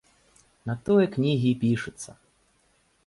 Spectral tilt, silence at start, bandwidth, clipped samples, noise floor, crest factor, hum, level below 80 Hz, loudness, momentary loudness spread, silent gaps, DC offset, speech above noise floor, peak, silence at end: -7 dB/octave; 0.65 s; 11.5 kHz; under 0.1%; -66 dBFS; 16 dB; none; -60 dBFS; -25 LUFS; 18 LU; none; under 0.1%; 42 dB; -10 dBFS; 0.95 s